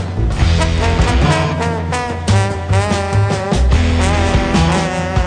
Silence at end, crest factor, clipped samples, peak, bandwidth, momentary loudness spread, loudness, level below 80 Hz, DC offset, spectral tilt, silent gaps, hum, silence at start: 0 s; 12 dB; under 0.1%; 0 dBFS; 10 kHz; 4 LU; -15 LUFS; -20 dBFS; under 0.1%; -5.5 dB/octave; none; none; 0 s